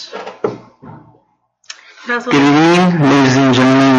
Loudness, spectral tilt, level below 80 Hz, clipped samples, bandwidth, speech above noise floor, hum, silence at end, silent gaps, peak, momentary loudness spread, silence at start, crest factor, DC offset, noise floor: -11 LUFS; -6 dB/octave; -54 dBFS; under 0.1%; 9.2 kHz; 48 dB; none; 0 s; none; 0 dBFS; 19 LU; 0 s; 12 dB; under 0.1%; -58 dBFS